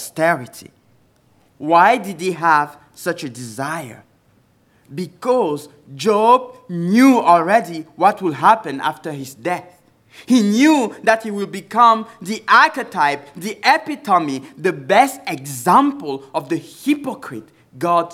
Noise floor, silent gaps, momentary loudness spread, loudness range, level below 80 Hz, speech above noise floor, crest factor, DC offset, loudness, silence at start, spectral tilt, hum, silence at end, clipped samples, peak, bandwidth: -57 dBFS; none; 16 LU; 5 LU; -68 dBFS; 40 dB; 18 dB; under 0.1%; -17 LUFS; 0 s; -5 dB/octave; none; 0 s; under 0.1%; 0 dBFS; 16 kHz